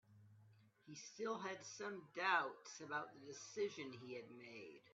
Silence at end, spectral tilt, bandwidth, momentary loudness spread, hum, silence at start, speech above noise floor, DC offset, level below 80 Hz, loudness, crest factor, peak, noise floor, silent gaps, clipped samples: 0 s; -1.5 dB/octave; 8 kHz; 17 LU; none; 0.1 s; 23 dB; under 0.1%; under -90 dBFS; -46 LUFS; 24 dB; -24 dBFS; -70 dBFS; none; under 0.1%